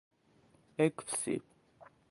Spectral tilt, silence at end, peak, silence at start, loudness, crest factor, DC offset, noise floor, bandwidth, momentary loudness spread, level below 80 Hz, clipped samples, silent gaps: -4.5 dB/octave; 0.25 s; -16 dBFS; 0.8 s; -35 LUFS; 24 dB; under 0.1%; -68 dBFS; 11.5 kHz; 9 LU; -78 dBFS; under 0.1%; none